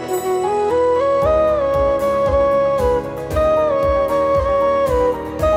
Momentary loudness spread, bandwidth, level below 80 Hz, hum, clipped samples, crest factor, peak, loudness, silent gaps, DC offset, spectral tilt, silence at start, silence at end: 4 LU; 16 kHz; -32 dBFS; none; under 0.1%; 10 dB; -6 dBFS; -17 LUFS; none; under 0.1%; -6.5 dB/octave; 0 s; 0 s